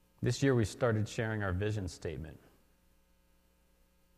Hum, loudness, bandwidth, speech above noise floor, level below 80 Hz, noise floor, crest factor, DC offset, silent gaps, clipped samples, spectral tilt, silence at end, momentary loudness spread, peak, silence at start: none; -34 LUFS; 13.5 kHz; 36 dB; -56 dBFS; -69 dBFS; 20 dB; under 0.1%; none; under 0.1%; -6 dB/octave; 1.8 s; 12 LU; -16 dBFS; 0.2 s